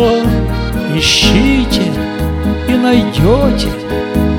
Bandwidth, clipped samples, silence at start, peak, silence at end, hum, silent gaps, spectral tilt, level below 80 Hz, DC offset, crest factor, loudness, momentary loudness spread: 18 kHz; 0.1%; 0 s; 0 dBFS; 0 s; none; none; -5 dB/octave; -20 dBFS; under 0.1%; 12 dB; -12 LUFS; 8 LU